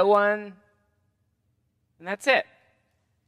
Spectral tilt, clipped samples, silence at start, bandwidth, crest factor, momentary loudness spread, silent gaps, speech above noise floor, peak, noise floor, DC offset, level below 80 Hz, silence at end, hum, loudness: -4 dB/octave; under 0.1%; 0 s; 13.5 kHz; 22 dB; 22 LU; none; 49 dB; -6 dBFS; -72 dBFS; under 0.1%; -80 dBFS; 0.85 s; none; -24 LUFS